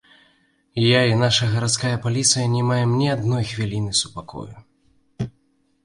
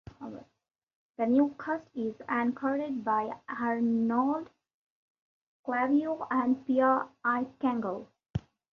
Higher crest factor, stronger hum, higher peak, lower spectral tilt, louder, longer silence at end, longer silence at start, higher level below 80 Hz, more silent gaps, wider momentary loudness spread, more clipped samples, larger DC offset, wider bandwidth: about the same, 18 dB vs 18 dB; neither; first, -4 dBFS vs -14 dBFS; second, -4 dB/octave vs -8.5 dB/octave; first, -20 LUFS vs -30 LUFS; first, 0.55 s vs 0.35 s; first, 0.75 s vs 0.2 s; first, -50 dBFS vs -62 dBFS; second, none vs 0.83-0.87 s, 0.95-1.14 s, 4.74-5.15 s, 5.22-5.64 s, 8.30-8.34 s; about the same, 15 LU vs 13 LU; neither; neither; first, 11.5 kHz vs 6.4 kHz